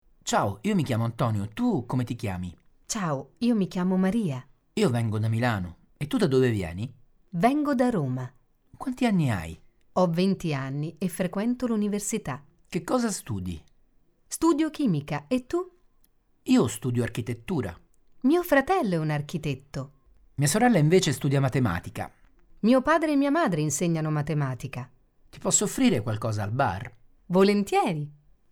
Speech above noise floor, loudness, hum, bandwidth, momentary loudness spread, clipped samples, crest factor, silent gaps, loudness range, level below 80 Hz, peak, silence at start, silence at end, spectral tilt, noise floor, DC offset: 37 dB; -26 LUFS; none; 18 kHz; 15 LU; under 0.1%; 16 dB; none; 4 LU; -54 dBFS; -10 dBFS; 0.25 s; 0.4 s; -5.5 dB/octave; -63 dBFS; under 0.1%